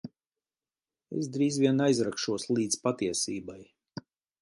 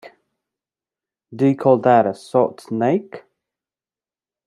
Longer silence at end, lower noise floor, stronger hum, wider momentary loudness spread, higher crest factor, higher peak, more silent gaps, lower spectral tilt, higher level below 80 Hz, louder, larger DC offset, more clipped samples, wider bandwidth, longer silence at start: second, 0.4 s vs 1.3 s; about the same, under -90 dBFS vs under -90 dBFS; neither; first, 21 LU vs 8 LU; about the same, 20 dB vs 20 dB; second, -10 dBFS vs -2 dBFS; first, 0.27-0.31 s vs none; second, -4.5 dB/octave vs -8 dB/octave; about the same, -68 dBFS vs -70 dBFS; second, -29 LUFS vs -18 LUFS; neither; neither; about the same, 11.5 kHz vs 11.5 kHz; second, 0.05 s vs 1.3 s